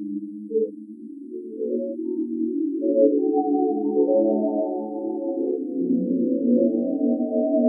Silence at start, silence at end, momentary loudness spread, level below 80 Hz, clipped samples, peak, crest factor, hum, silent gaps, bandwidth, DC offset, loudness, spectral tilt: 0 s; 0 s; 12 LU; under -90 dBFS; under 0.1%; -6 dBFS; 16 dB; none; none; 1 kHz; under 0.1%; -23 LUFS; -15.5 dB/octave